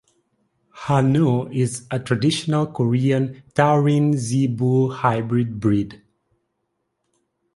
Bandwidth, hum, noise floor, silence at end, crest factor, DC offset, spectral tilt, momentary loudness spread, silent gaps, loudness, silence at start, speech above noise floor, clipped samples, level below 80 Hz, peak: 11.5 kHz; none; -74 dBFS; 1.6 s; 18 dB; under 0.1%; -7 dB/octave; 7 LU; none; -20 LUFS; 0.75 s; 55 dB; under 0.1%; -54 dBFS; -2 dBFS